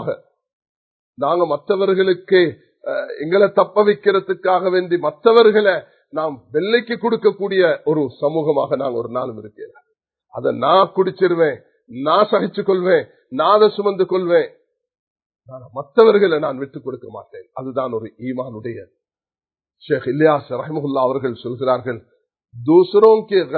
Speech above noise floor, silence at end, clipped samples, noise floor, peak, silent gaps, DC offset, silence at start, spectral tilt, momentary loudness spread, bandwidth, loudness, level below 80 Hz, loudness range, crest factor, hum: over 73 dB; 0 s; under 0.1%; under -90 dBFS; 0 dBFS; 0.53-0.62 s, 0.69-1.13 s, 14.99-15.16 s, 15.26-15.30 s; under 0.1%; 0 s; -9 dB/octave; 16 LU; 4.6 kHz; -17 LUFS; -66 dBFS; 6 LU; 18 dB; none